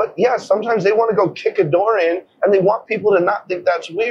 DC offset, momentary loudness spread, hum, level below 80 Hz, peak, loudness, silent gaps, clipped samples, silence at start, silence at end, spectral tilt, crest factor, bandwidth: under 0.1%; 5 LU; none; -62 dBFS; -4 dBFS; -17 LUFS; none; under 0.1%; 0 s; 0 s; -6.5 dB/octave; 12 dB; 8 kHz